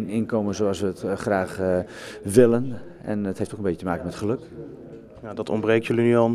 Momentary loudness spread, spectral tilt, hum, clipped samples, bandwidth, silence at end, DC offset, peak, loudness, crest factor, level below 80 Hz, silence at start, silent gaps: 18 LU; -6.5 dB/octave; none; under 0.1%; 14 kHz; 0 s; under 0.1%; -2 dBFS; -24 LUFS; 22 dB; -54 dBFS; 0 s; none